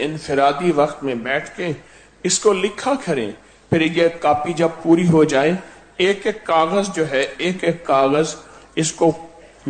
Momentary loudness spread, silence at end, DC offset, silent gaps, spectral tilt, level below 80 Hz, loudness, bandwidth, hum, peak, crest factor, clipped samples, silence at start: 11 LU; 0 s; under 0.1%; none; -4.5 dB/octave; -52 dBFS; -19 LUFS; 9.4 kHz; none; -4 dBFS; 16 dB; under 0.1%; 0 s